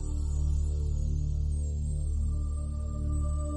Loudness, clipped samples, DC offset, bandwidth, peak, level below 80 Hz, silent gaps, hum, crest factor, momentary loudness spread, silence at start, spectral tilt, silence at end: -32 LUFS; under 0.1%; under 0.1%; 9 kHz; -20 dBFS; -30 dBFS; none; none; 10 dB; 4 LU; 0 s; -8 dB/octave; 0 s